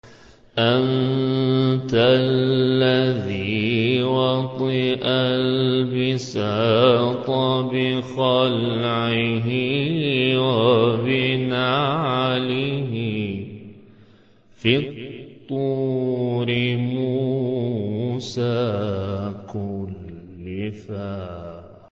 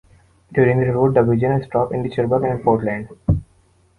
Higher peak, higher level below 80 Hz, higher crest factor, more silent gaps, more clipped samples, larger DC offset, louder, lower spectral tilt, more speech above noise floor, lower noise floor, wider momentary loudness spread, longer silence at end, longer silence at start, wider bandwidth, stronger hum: about the same, -4 dBFS vs -2 dBFS; second, -52 dBFS vs -38 dBFS; about the same, 18 dB vs 16 dB; neither; neither; neither; about the same, -21 LUFS vs -19 LUFS; second, -7 dB/octave vs -10 dB/octave; second, 32 dB vs 39 dB; second, -52 dBFS vs -56 dBFS; first, 13 LU vs 7 LU; second, 0.2 s vs 0.55 s; second, 0.05 s vs 0.5 s; second, 7.4 kHz vs 9.8 kHz; neither